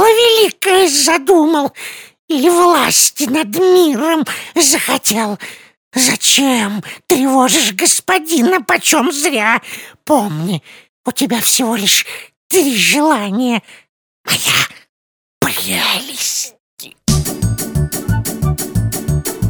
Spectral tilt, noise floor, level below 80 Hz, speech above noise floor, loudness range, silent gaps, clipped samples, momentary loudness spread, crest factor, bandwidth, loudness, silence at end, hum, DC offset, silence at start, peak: -3 dB/octave; under -90 dBFS; -34 dBFS; over 77 dB; 5 LU; 2.19-2.28 s, 5.77-5.91 s, 10.89-11.04 s, 12.37-12.50 s, 13.89-14.24 s, 14.89-15.41 s, 16.60-16.77 s; under 0.1%; 11 LU; 14 dB; over 20 kHz; -13 LUFS; 0 s; none; under 0.1%; 0 s; 0 dBFS